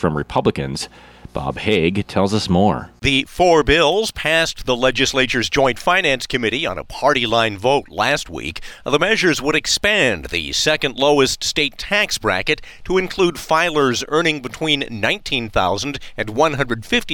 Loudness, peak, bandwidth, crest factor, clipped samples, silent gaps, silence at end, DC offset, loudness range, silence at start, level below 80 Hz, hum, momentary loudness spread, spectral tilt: -17 LUFS; -2 dBFS; 17.5 kHz; 16 dB; under 0.1%; none; 0 s; under 0.1%; 3 LU; 0 s; -38 dBFS; none; 8 LU; -3.5 dB/octave